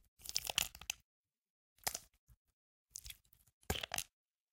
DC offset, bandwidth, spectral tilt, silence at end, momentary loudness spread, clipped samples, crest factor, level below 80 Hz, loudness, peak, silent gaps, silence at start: under 0.1%; 17 kHz; -1 dB/octave; 0.45 s; 16 LU; under 0.1%; 34 dB; -62 dBFS; -42 LUFS; -14 dBFS; 1.04-1.24 s, 1.38-1.76 s, 2.18-2.27 s, 2.37-2.45 s, 2.53-2.86 s, 3.53-3.61 s; 0.2 s